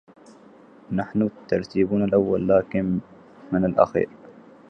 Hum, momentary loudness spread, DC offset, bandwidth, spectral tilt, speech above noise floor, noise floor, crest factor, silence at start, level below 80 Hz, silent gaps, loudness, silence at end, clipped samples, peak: none; 9 LU; under 0.1%; 6.6 kHz; -9 dB/octave; 28 dB; -49 dBFS; 22 dB; 0.9 s; -52 dBFS; none; -23 LUFS; 0.4 s; under 0.1%; -2 dBFS